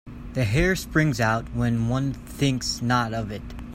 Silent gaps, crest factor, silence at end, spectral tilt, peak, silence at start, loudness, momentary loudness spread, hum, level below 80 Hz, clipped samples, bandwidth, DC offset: none; 16 dB; 0 s; -5.5 dB/octave; -8 dBFS; 0.05 s; -24 LUFS; 9 LU; none; -38 dBFS; under 0.1%; 16 kHz; under 0.1%